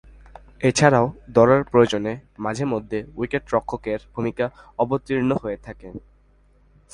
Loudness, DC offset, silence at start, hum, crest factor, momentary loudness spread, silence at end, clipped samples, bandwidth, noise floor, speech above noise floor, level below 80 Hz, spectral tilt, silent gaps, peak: -22 LUFS; under 0.1%; 0.6 s; none; 22 dB; 15 LU; 0.95 s; under 0.1%; 11.5 kHz; -56 dBFS; 35 dB; -48 dBFS; -6 dB/octave; none; 0 dBFS